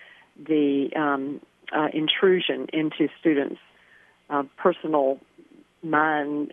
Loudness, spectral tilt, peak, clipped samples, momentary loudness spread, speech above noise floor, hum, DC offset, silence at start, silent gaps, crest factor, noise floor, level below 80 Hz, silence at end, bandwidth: -24 LUFS; -7.5 dB/octave; -6 dBFS; under 0.1%; 13 LU; 33 dB; none; under 0.1%; 0.4 s; none; 18 dB; -57 dBFS; -78 dBFS; 0.05 s; 3.8 kHz